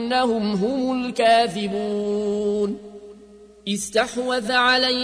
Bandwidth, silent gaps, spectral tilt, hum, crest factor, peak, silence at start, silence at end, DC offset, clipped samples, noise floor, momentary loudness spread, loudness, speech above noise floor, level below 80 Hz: 11 kHz; none; -4 dB/octave; none; 14 dB; -8 dBFS; 0 s; 0 s; under 0.1%; under 0.1%; -47 dBFS; 10 LU; -21 LUFS; 26 dB; -56 dBFS